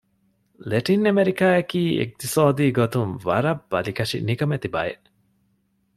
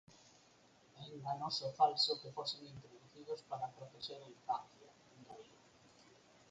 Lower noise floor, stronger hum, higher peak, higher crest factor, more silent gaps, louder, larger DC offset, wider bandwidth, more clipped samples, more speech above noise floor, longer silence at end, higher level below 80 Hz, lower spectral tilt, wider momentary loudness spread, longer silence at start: about the same, -67 dBFS vs -68 dBFS; neither; first, -4 dBFS vs -20 dBFS; second, 18 dB vs 24 dB; neither; first, -22 LUFS vs -40 LUFS; neither; first, 15.5 kHz vs 9 kHz; neither; first, 46 dB vs 27 dB; first, 1.05 s vs 0.35 s; first, -58 dBFS vs -82 dBFS; first, -6 dB/octave vs -3.5 dB/octave; second, 8 LU vs 23 LU; first, 0.6 s vs 0.1 s